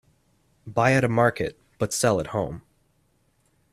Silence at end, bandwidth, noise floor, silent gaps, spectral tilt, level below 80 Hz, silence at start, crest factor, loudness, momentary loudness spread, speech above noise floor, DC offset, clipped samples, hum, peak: 1.1 s; 15.5 kHz; -66 dBFS; none; -5 dB/octave; -54 dBFS; 0.65 s; 20 dB; -24 LUFS; 12 LU; 44 dB; under 0.1%; under 0.1%; none; -6 dBFS